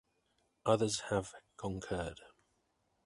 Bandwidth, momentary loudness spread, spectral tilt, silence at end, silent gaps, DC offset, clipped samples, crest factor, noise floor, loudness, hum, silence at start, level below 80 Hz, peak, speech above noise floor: 11.5 kHz; 14 LU; -4.5 dB/octave; 0.8 s; none; under 0.1%; under 0.1%; 24 dB; -79 dBFS; -37 LUFS; none; 0.65 s; -60 dBFS; -14 dBFS; 43 dB